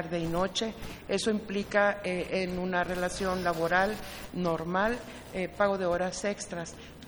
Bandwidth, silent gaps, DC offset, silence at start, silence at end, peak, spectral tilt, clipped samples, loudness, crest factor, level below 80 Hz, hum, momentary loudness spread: over 20 kHz; none; under 0.1%; 0 s; 0 s; -10 dBFS; -4.5 dB/octave; under 0.1%; -30 LUFS; 20 dB; -52 dBFS; none; 11 LU